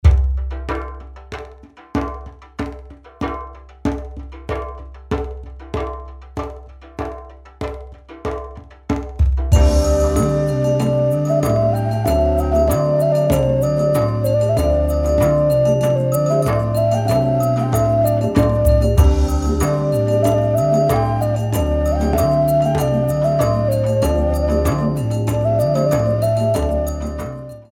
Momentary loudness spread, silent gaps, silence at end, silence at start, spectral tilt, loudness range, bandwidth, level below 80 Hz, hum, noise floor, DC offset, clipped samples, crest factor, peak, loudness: 15 LU; none; 0.1 s; 0.05 s; -7.5 dB/octave; 12 LU; 17 kHz; -24 dBFS; none; -41 dBFS; under 0.1%; under 0.1%; 16 dB; 0 dBFS; -18 LUFS